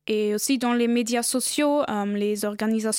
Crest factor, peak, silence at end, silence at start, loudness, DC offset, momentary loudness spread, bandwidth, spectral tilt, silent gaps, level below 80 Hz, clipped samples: 12 dB; -12 dBFS; 0 s; 0.1 s; -24 LUFS; under 0.1%; 4 LU; 17 kHz; -3.5 dB/octave; none; -70 dBFS; under 0.1%